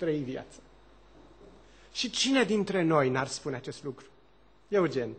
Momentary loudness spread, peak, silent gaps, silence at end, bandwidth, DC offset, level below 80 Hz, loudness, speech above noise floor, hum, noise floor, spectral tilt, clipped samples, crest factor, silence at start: 16 LU; -12 dBFS; none; 0 s; 9 kHz; under 0.1%; -62 dBFS; -29 LUFS; 33 dB; none; -62 dBFS; -4.5 dB/octave; under 0.1%; 20 dB; 0 s